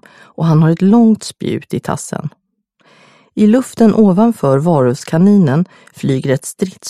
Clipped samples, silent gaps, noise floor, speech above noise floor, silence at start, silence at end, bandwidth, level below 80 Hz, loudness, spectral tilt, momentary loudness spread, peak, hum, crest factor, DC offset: under 0.1%; none; -56 dBFS; 44 dB; 0.4 s; 0 s; 13.5 kHz; -52 dBFS; -13 LUFS; -7.5 dB/octave; 12 LU; 0 dBFS; none; 12 dB; under 0.1%